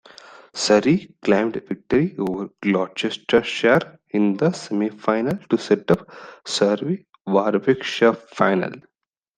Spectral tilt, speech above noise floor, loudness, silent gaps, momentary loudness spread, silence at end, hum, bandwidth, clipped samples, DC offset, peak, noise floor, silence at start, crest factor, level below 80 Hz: -5.5 dB/octave; 25 dB; -21 LUFS; none; 9 LU; 0.55 s; none; 9.8 kHz; under 0.1%; under 0.1%; -2 dBFS; -45 dBFS; 0.55 s; 18 dB; -58 dBFS